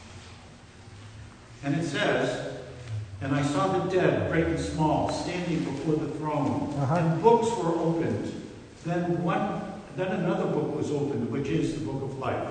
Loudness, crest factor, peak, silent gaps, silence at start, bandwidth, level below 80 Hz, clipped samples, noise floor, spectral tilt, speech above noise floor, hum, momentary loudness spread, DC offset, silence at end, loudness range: -28 LUFS; 20 dB; -8 dBFS; none; 0 s; 9.6 kHz; -52 dBFS; under 0.1%; -49 dBFS; -6.5 dB/octave; 22 dB; none; 17 LU; under 0.1%; 0 s; 3 LU